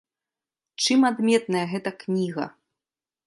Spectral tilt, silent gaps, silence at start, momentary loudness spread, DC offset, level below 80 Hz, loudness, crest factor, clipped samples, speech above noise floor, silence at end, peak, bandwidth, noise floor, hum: -4.5 dB/octave; none; 0.8 s; 13 LU; under 0.1%; -76 dBFS; -24 LUFS; 18 dB; under 0.1%; over 67 dB; 0.8 s; -6 dBFS; 11.5 kHz; under -90 dBFS; none